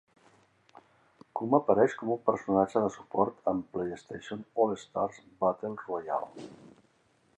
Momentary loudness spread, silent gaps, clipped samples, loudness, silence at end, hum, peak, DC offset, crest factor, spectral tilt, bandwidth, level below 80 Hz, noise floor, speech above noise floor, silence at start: 15 LU; none; under 0.1%; -30 LUFS; 0.7 s; none; -8 dBFS; under 0.1%; 24 dB; -7 dB/octave; 8.8 kHz; -68 dBFS; -68 dBFS; 38 dB; 1.35 s